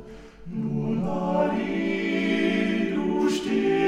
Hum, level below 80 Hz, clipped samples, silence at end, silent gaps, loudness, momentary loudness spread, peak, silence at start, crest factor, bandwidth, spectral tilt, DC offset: none; -54 dBFS; under 0.1%; 0 s; none; -25 LUFS; 8 LU; -12 dBFS; 0 s; 14 dB; 12 kHz; -6.5 dB/octave; under 0.1%